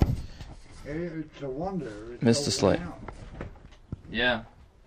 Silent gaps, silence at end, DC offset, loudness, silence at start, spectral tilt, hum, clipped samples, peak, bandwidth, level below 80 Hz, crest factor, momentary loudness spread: none; 0.2 s; under 0.1%; -29 LUFS; 0 s; -5 dB/octave; none; under 0.1%; -8 dBFS; 15.5 kHz; -42 dBFS; 22 dB; 20 LU